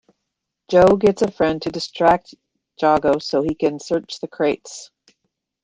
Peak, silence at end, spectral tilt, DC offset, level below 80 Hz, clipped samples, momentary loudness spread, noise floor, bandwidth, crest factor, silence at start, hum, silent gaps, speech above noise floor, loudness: -2 dBFS; 0.8 s; -5.5 dB/octave; under 0.1%; -50 dBFS; under 0.1%; 12 LU; -79 dBFS; 9.6 kHz; 18 dB; 0.7 s; none; none; 61 dB; -19 LUFS